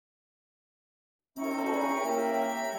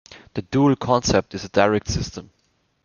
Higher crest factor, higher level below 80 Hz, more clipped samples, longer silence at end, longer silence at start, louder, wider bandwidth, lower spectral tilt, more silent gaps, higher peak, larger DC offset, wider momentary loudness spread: second, 14 dB vs 20 dB; second, -82 dBFS vs -42 dBFS; neither; second, 0 s vs 0.6 s; first, 1.35 s vs 0.1 s; second, -30 LUFS vs -20 LUFS; first, 16.5 kHz vs 7.2 kHz; second, -3 dB/octave vs -5.5 dB/octave; neither; second, -18 dBFS vs -2 dBFS; neither; second, 8 LU vs 14 LU